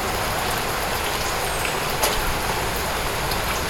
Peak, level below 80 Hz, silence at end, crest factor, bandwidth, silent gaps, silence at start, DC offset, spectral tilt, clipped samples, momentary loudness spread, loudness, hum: -4 dBFS; -34 dBFS; 0 s; 20 dB; 19 kHz; none; 0 s; under 0.1%; -2.5 dB/octave; under 0.1%; 3 LU; -23 LUFS; none